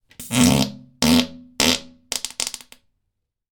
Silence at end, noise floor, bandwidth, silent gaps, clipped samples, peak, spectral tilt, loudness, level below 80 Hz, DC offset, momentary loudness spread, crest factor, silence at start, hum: 0.95 s; -77 dBFS; 19 kHz; none; under 0.1%; -2 dBFS; -3.5 dB/octave; -20 LUFS; -44 dBFS; under 0.1%; 11 LU; 22 dB; 0.2 s; none